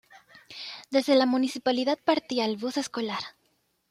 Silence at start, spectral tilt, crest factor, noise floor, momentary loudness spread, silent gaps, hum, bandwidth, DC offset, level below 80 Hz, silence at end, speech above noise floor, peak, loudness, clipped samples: 0.1 s; -3.5 dB/octave; 18 dB; -71 dBFS; 16 LU; none; none; 14.5 kHz; under 0.1%; -74 dBFS; 0.6 s; 46 dB; -10 dBFS; -26 LUFS; under 0.1%